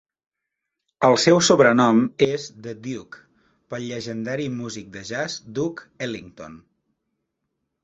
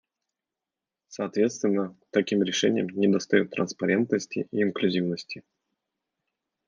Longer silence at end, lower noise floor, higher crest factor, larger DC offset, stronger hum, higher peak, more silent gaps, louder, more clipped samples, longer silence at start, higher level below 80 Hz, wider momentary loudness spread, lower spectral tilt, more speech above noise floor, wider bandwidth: about the same, 1.25 s vs 1.3 s; second, -82 dBFS vs -89 dBFS; about the same, 22 dB vs 20 dB; neither; neither; first, -2 dBFS vs -8 dBFS; neither; first, -21 LUFS vs -26 LUFS; neither; about the same, 1 s vs 1.1 s; first, -60 dBFS vs -76 dBFS; first, 20 LU vs 9 LU; about the same, -4.5 dB/octave vs -5 dB/octave; about the same, 61 dB vs 63 dB; about the same, 8.2 kHz vs 7.6 kHz